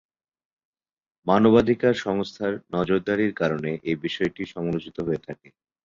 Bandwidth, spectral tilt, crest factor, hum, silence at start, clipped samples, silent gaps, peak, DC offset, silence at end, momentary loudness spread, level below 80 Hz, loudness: 7.4 kHz; -7 dB/octave; 20 dB; none; 1.25 s; under 0.1%; none; -4 dBFS; under 0.1%; 0.5 s; 12 LU; -54 dBFS; -24 LUFS